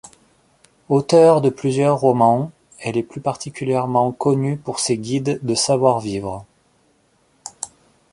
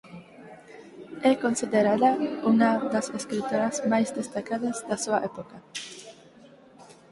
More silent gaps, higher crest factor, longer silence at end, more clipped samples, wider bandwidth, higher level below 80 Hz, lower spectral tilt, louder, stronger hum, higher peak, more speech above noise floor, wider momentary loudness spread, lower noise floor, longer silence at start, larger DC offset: neither; about the same, 18 dB vs 18 dB; first, 0.45 s vs 0.2 s; neither; about the same, 11.5 kHz vs 11.5 kHz; first, -56 dBFS vs -68 dBFS; about the same, -5.5 dB/octave vs -4.5 dB/octave; first, -18 LUFS vs -26 LUFS; neither; first, -2 dBFS vs -8 dBFS; first, 43 dB vs 27 dB; second, 17 LU vs 23 LU; first, -60 dBFS vs -52 dBFS; first, 0.9 s vs 0.05 s; neither